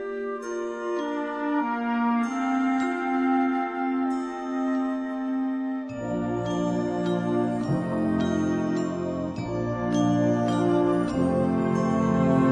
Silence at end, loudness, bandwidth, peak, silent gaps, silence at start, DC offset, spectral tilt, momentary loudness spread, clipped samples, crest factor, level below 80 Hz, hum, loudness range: 0 s; -26 LUFS; 9.8 kHz; -10 dBFS; none; 0 s; under 0.1%; -7.5 dB/octave; 7 LU; under 0.1%; 14 dB; -54 dBFS; none; 3 LU